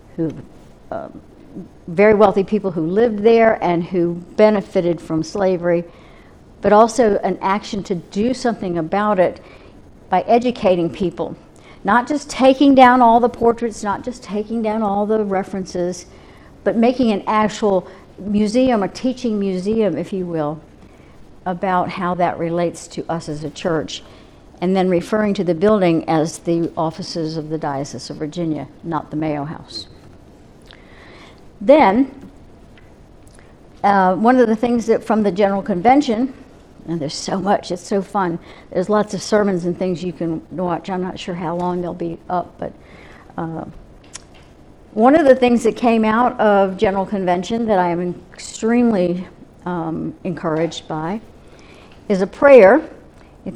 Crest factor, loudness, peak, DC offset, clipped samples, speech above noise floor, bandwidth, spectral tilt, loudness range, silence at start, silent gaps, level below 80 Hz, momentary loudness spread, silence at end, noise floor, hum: 18 dB; -17 LUFS; 0 dBFS; under 0.1%; under 0.1%; 27 dB; 11.5 kHz; -6 dB/octave; 8 LU; 0.15 s; none; -48 dBFS; 16 LU; 0 s; -44 dBFS; none